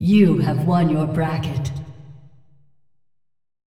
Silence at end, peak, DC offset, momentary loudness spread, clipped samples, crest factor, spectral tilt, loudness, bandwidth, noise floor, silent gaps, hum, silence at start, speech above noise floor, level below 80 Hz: 1.4 s; -4 dBFS; under 0.1%; 15 LU; under 0.1%; 16 dB; -8.5 dB/octave; -19 LUFS; 12 kHz; -69 dBFS; none; none; 0 s; 52 dB; -50 dBFS